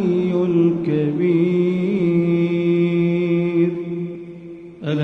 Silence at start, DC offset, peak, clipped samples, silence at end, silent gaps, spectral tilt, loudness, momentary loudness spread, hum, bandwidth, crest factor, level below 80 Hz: 0 s; under 0.1%; -8 dBFS; under 0.1%; 0 s; none; -10 dB/octave; -19 LUFS; 13 LU; none; 5.8 kHz; 12 dB; -60 dBFS